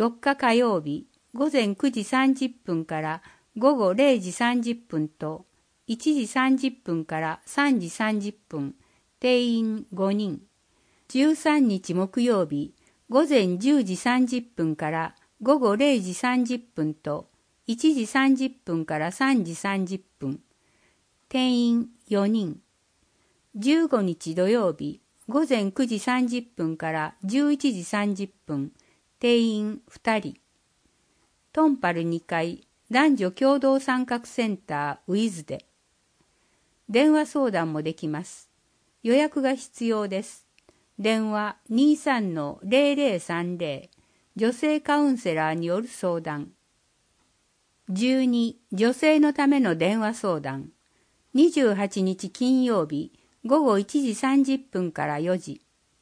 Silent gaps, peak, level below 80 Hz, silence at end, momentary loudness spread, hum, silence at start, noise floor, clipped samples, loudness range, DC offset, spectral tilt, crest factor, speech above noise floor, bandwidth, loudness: none; -6 dBFS; -70 dBFS; 0.45 s; 13 LU; none; 0 s; -68 dBFS; under 0.1%; 4 LU; under 0.1%; -5.5 dB/octave; 18 dB; 45 dB; 10.5 kHz; -25 LUFS